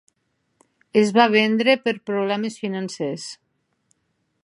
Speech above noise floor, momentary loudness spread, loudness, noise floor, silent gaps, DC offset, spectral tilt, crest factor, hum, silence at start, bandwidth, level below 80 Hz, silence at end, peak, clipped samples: 52 dB; 12 LU; -20 LUFS; -72 dBFS; none; under 0.1%; -5 dB/octave; 22 dB; none; 0.95 s; 11.5 kHz; -74 dBFS; 1.1 s; -2 dBFS; under 0.1%